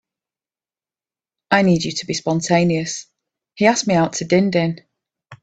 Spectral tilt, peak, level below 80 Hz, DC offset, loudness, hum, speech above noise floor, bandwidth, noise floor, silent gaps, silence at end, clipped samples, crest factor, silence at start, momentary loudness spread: -5 dB/octave; 0 dBFS; -56 dBFS; under 0.1%; -18 LUFS; none; over 73 dB; 9 kHz; under -90 dBFS; none; 0.05 s; under 0.1%; 20 dB; 1.5 s; 9 LU